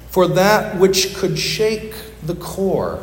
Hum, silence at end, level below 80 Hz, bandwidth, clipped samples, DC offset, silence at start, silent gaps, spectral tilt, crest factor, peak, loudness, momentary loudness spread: none; 0 s; -40 dBFS; 17 kHz; under 0.1%; under 0.1%; 0 s; none; -4 dB/octave; 16 dB; 0 dBFS; -17 LUFS; 13 LU